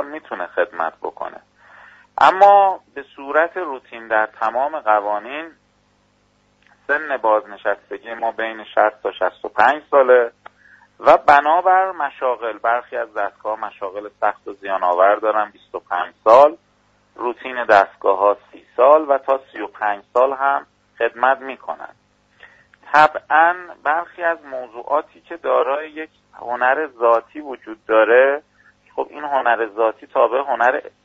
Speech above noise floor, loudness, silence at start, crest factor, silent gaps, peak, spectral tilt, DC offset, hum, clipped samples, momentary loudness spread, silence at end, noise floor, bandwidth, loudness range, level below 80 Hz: 42 dB; -18 LUFS; 0 s; 18 dB; none; 0 dBFS; -4.5 dB/octave; under 0.1%; 50 Hz at -65 dBFS; under 0.1%; 17 LU; 0.25 s; -60 dBFS; 7.8 kHz; 6 LU; -62 dBFS